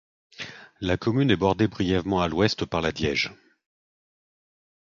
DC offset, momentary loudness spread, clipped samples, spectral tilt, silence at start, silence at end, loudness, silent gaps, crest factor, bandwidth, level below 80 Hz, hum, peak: under 0.1%; 16 LU; under 0.1%; -6 dB/octave; 0.4 s; 1.6 s; -24 LUFS; none; 22 dB; 7.6 kHz; -46 dBFS; none; -4 dBFS